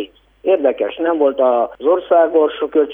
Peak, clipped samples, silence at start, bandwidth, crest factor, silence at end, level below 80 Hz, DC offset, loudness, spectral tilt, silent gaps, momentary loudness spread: -2 dBFS; under 0.1%; 0 s; 3.8 kHz; 14 dB; 0 s; -58 dBFS; under 0.1%; -16 LUFS; -7.5 dB/octave; none; 6 LU